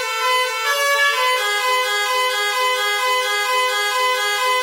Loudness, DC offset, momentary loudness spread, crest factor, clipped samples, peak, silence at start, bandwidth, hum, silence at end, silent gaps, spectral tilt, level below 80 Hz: -17 LUFS; under 0.1%; 2 LU; 14 dB; under 0.1%; -4 dBFS; 0 s; 16.5 kHz; none; 0 s; none; 4.5 dB/octave; -88 dBFS